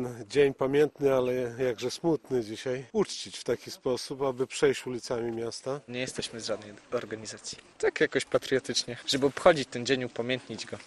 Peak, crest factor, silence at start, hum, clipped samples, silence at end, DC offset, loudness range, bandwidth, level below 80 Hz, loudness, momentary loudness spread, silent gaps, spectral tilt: -6 dBFS; 24 dB; 0 s; none; under 0.1%; 0 s; under 0.1%; 5 LU; 13 kHz; -62 dBFS; -30 LUFS; 10 LU; none; -4 dB/octave